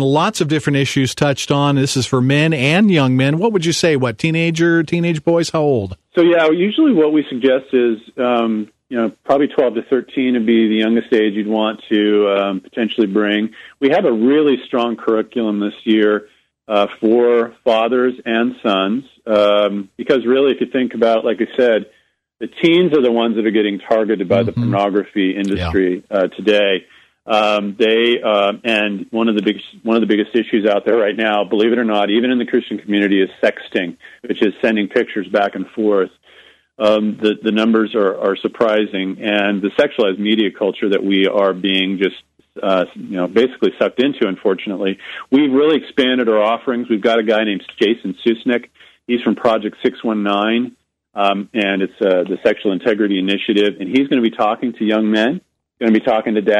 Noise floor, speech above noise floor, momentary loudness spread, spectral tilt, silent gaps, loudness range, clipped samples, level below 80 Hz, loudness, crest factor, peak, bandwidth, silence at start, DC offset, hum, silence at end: -47 dBFS; 32 dB; 6 LU; -6 dB/octave; none; 3 LU; under 0.1%; -52 dBFS; -16 LUFS; 14 dB; -2 dBFS; 12 kHz; 0 s; under 0.1%; none; 0 s